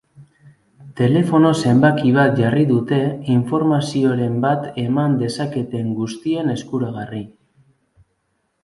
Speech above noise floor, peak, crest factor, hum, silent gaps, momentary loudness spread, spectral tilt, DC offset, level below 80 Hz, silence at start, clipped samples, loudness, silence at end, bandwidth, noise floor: 52 dB; 0 dBFS; 18 dB; none; none; 10 LU; -7.5 dB/octave; under 0.1%; -56 dBFS; 0.2 s; under 0.1%; -18 LUFS; 1.35 s; 11.5 kHz; -69 dBFS